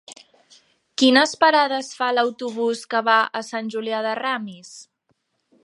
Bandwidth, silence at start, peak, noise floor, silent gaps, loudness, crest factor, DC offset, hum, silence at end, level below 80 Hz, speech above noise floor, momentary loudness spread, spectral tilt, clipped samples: 11.5 kHz; 0.1 s; -2 dBFS; -70 dBFS; none; -20 LUFS; 20 dB; under 0.1%; none; 0.8 s; -76 dBFS; 49 dB; 13 LU; -2.5 dB/octave; under 0.1%